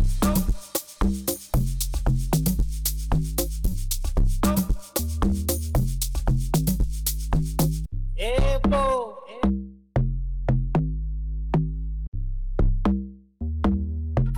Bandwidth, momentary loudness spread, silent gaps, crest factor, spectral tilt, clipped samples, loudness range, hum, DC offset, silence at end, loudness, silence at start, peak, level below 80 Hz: over 20 kHz; 8 LU; 12.08-12.12 s; 10 dB; -6 dB/octave; under 0.1%; 2 LU; none; under 0.1%; 0 s; -26 LUFS; 0 s; -14 dBFS; -26 dBFS